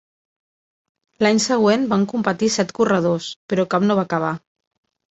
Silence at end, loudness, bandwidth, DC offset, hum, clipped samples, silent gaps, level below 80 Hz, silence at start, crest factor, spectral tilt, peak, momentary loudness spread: 0.75 s; -19 LUFS; 8.2 kHz; under 0.1%; none; under 0.1%; 3.36-3.49 s; -62 dBFS; 1.2 s; 18 dB; -5 dB/octave; -2 dBFS; 7 LU